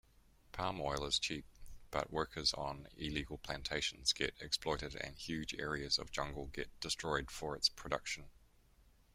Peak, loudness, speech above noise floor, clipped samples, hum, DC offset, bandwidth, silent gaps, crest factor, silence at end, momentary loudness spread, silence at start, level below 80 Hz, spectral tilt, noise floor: -18 dBFS; -39 LUFS; 27 dB; under 0.1%; none; under 0.1%; 16 kHz; none; 24 dB; 0.25 s; 10 LU; 0.5 s; -56 dBFS; -2.5 dB/octave; -68 dBFS